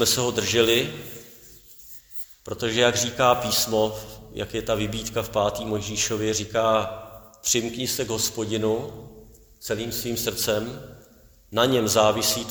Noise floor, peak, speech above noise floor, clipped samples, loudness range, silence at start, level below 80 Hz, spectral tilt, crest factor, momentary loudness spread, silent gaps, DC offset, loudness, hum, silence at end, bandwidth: -53 dBFS; -4 dBFS; 29 dB; under 0.1%; 3 LU; 0 s; -50 dBFS; -3 dB/octave; 22 dB; 18 LU; none; under 0.1%; -23 LUFS; none; 0 s; over 20 kHz